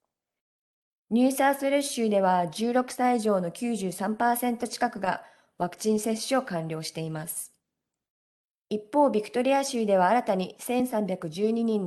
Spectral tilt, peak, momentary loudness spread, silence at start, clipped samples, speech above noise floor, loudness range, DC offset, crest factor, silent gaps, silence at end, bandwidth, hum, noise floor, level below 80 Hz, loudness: -5 dB/octave; -10 dBFS; 10 LU; 1.1 s; under 0.1%; 60 dB; 6 LU; under 0.1%; 18 dB; 8.10-8.65 s; 0 s; 12.5 kHz; none; -86 dBFS; -72 dBFS; -27 LUFS